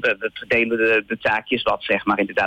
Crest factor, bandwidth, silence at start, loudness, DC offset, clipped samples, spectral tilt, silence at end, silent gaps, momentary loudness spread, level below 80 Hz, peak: 12 dB; 16.5 kHz; 0 s; -20 LUFS; under 0.1%; under 0.1%; -5.5 dB/octave; 0 s; none; 4 LU; -54 dBFS; -8 dBFS